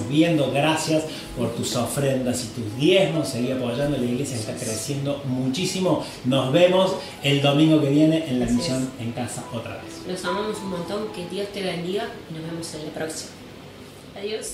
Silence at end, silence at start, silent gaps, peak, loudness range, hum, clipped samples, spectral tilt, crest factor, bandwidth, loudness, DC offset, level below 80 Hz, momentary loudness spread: 0 s; 0 s; none; -4 dBFS; 9 LU; none; under 0.1%; -5 dB/octave; 20 dB; 16 kHz; -23 LUFS; under 0.1%; -52 dBFS; 15 LU